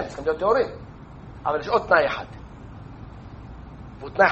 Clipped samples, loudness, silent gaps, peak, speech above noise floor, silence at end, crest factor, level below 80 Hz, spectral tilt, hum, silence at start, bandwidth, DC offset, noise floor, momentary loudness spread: under 0.1%; -23 LUFS; none; -2 dBFS; 19 dB; 0 s; 22 dB; -46 dBFS; -6 dB/octave; none; 0 s; 8.2 kHz; under 0.1%; -41 dBFS; 22 LU